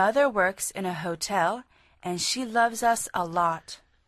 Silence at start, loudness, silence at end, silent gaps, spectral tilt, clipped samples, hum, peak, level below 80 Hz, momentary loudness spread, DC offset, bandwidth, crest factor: 0 s; -26 LUFS; 0.3 s; none; -3 dB/octave; under 0.1%; none; -10 dBFS; -62 dBFS; 12 LU; under 0.1%; 13.5 kHz; 16 dB